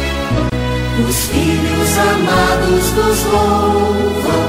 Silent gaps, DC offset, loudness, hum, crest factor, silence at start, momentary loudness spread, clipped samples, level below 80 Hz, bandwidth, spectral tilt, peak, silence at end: none; under 0.1%; -14 LUFS; none; 12 dB; 0 s; 4 LU; under 0.1%; -24 dBFS; 16.5 kHz; -4.5 dB/octave; -2 dBFS; 0 s